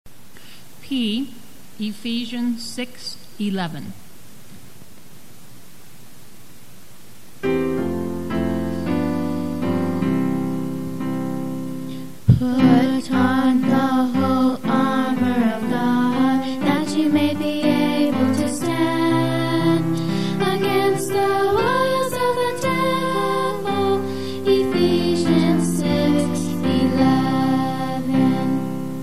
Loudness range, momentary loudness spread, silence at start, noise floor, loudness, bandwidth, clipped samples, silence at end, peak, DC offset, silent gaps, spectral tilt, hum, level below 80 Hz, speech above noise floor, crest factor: 10 LU; 10 LU; 0.05 s; -46 dBFS; -20 LUFS; 15 kHz; under 0.1%; 0 s; -2 dBFS; 2%; none; -6 dB/octave; none; -50 dBFS; 21 dB; 18 dB